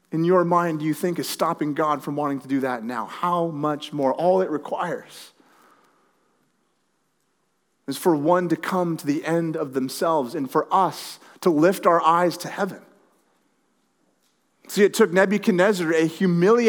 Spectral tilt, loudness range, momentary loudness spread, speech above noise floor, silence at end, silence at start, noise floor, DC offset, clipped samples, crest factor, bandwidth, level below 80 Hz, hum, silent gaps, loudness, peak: -6 dB/octave; 6 LU; 10 LU; 49 dB; 0 s; 0.1 s; -71 dBFS; under 0.1%; under 0.1%; 20 dB; over 20 kHz; -86 dBFS; none; none; -22 LUFS; -4 dBFS